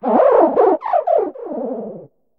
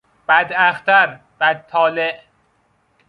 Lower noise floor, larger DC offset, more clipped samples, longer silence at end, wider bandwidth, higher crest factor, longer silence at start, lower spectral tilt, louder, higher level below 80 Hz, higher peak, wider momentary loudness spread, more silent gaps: second, -37 dBFS vs -61 dBFS; neither; neither; second, 0.35 s vs 0.9 s; second, 4.7 kHz vs 5.2 kHz; about the same, 16 dB vs 18 dB; second, 0 s vs 0.3 s; first, -9 dB/octave vs -5 dB/octave; about the same, -16 LUFS vs -16 LUFS; about the same, -64 dBFS vs -68 dBFS; about the same, 0 dBFS vs 0 dBFS; first, 15 LU vs 9 LU; neither